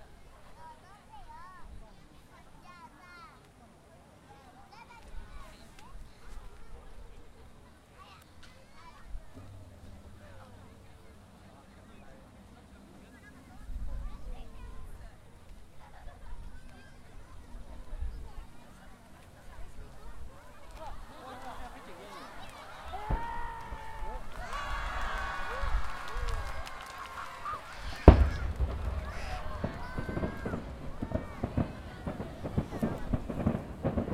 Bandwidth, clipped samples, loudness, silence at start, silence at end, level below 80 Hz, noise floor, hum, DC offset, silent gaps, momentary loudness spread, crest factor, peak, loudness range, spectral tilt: 14 kHz; under 0.1%; -35 LUFS; 0 s; 0 s; -40 dBFS; -57 dBFS; none; under 0.1%; none; 20 LU; 36 dB; 0 dBFS; 24 LU; -7 dB/octave